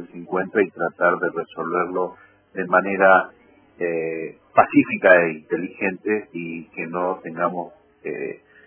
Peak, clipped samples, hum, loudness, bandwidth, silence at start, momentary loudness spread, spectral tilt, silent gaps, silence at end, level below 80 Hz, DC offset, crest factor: 0 dBFS; under 0.1%; none; -21 LUFS; 4 kHz; 0 s; 16 LU; -10 dB/octave; none; 0.3 s; -66 dBFS; under 0.1%; 22 dB